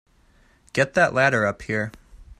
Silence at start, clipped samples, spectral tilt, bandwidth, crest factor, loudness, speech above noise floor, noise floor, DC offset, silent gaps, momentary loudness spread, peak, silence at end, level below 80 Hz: 0.75 s; under 0.1%; -5 dB/octave; 12.5 kHz; 20 dB; -21 LUFS; 36 dB; -58 dBFS; under 0.1%; none; 10 LU; -4 dBFS; 0.05 s; -50 dBFS